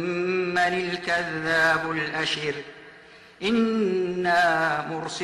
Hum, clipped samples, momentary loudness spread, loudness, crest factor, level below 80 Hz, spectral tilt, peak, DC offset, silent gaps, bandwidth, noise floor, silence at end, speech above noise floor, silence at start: none; under 0.1%; 9 LU; -24 LUFS; 14 dB; -60 dBFS; -4.5 dB/octave; -12 dBFS; under 0.1%; none; 12.5 kHz; -49 dBFS; 0 s; 25 dB; 0 s